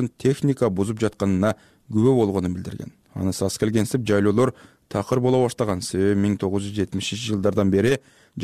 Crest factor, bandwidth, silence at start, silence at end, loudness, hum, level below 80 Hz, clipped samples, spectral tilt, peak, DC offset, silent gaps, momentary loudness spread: 14 dB; 15 kHz; 0 s; 0 s; -22 LUFS; none; -52 dBFS; under 0.1%; -6.5 dB/octave; -8 dBFS; under 0.1%; none; 9 LU